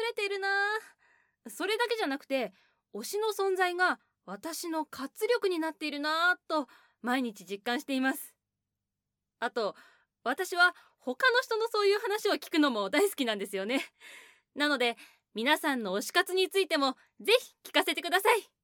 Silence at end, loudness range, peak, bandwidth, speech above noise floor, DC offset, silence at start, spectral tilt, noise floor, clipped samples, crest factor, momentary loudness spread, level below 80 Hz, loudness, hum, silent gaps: 0.2 s; 5 LU; -10 dBFS; 19 kHz; 58 dB; under 0.1%; 0 s; -2 dB/octave; -88 dBFS; under 0.1%; 22 dB; 13 LU; -88 dBFS; -30 LUFS; 50 Hz at -80 dBFS; none